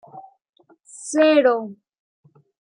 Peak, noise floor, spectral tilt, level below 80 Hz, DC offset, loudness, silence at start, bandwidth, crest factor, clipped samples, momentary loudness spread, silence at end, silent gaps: -4 dBFS; -46 dBFS; -3.5 dB/octave; -82 dBFS; under 0.1%; -18 LUFS; 0.15 s; 10.5 kHz; 18 dB; under 0.1%; 21 LU; 1.05 s; 0.49-0.53 s